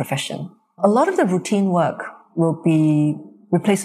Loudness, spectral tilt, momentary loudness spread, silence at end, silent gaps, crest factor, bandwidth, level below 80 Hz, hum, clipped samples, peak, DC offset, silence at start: -19 LUFS; -6.5 dB/octave; 14 LU; 0 s; none; 16 dB; 14.5 kHz; -68 dBFS; none; under 0.1%; -2 dBFS; under 0.1%; 0 s